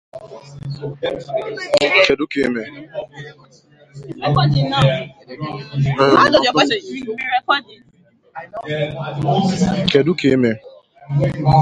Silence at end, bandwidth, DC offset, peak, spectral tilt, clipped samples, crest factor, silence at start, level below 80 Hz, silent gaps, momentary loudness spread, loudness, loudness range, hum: 0 s; 10.5 kHz; under 0.1%; 0 dBFS; -6 dB/octave; under 0.1%; 18 dB; 0.15 s; -44 dBFS; none; 21 LU; -17 LUFS; 4 LU; none